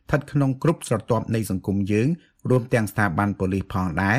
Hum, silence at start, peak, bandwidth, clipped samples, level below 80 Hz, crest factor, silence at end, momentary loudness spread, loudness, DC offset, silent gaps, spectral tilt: none; 0.1 s; -6 dBFS; 15.5 kHz; under 0.1%; -48 dBFS; 18 dB; 0 s; 4 LU; -23 LUFS; under 0.1%; none; -7 dB/octave